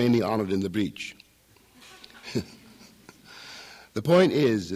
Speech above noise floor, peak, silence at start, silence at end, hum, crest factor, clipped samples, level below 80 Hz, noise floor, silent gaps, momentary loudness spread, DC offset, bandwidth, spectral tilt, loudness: 36 dB; -8 dBFS; 0 s; 0 s; none; 18 dB; under 0.1%; -64 dBFS; -59 dBFS; none; 25 LU; under 0.1%; 15.5 kHz; -6.5 dB/octave; -25 LUFS